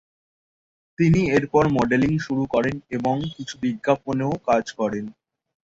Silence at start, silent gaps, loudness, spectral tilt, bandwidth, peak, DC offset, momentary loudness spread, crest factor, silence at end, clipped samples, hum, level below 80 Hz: 1 s; none; -22 LUFS; -7 dB/octave; 7.8 kHz; -4 dBFS; under 0.1%; 8 LU; 18 dB; 0.55 s; under 0.1%; none; -50 dBFS